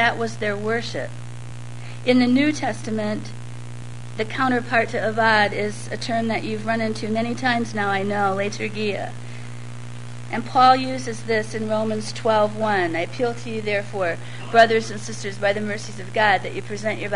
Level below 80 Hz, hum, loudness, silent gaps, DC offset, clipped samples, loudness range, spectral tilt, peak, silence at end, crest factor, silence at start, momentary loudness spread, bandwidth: -54 dBFS; 60 Hz at -35 dBFS; -22 LUFS; none; 2%; under 0.1%; 3 LU; -5 dB/octave; 0 dBFS; 0 s; 22 dB; 0 s; 19 LU; 11 kHz